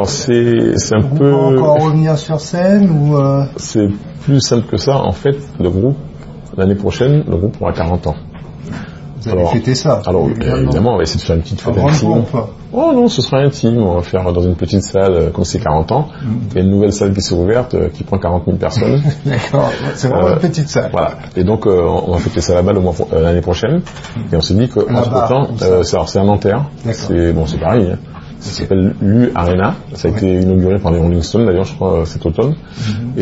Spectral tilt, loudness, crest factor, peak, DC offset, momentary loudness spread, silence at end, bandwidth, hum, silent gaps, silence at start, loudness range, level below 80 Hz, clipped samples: -6.5 dB/octave; -13 LUFS; 12 dB; 0 dBFS; under 0.1%; 7 LU; 0 s; 8 kHz; none; none; 0 s; 3 LU; -30 dBFS; under 0.1%